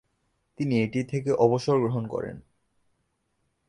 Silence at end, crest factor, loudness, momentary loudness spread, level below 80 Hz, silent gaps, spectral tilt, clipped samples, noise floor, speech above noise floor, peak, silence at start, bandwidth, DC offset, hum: 1.3 s; 20 dB; -26 LUFS; 11 LU; -62 dBFS; none; -7.5 dB/octave; under 0.1%; -75 dBFS; 49 dB; -8 dBFS; 0.6 s; 11 kHz; under 0.1%; none